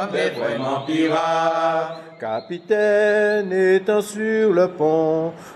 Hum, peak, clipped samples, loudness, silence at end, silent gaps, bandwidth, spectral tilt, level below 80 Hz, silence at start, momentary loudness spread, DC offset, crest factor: none; -6 dBFS; under 0.1%; -20 LUFS; 0 s; none; 13 kHz; -5.5 dB/octave; -70 dBFS; 0 s; 10 LU; under 0.1%; 14 dB